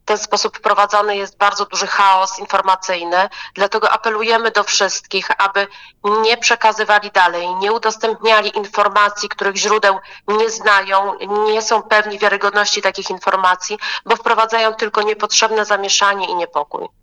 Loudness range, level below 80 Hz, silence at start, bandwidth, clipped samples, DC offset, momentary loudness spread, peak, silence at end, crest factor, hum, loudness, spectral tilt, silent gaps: 1 LU; -60 dBFS; 0.05 s; 10 kHz; under 0.1%; under 0.1%; 7 LU; 0 dBFS; 0.15 s; 14 dB; none; -15 LUFS; -0.5 dB/octave; none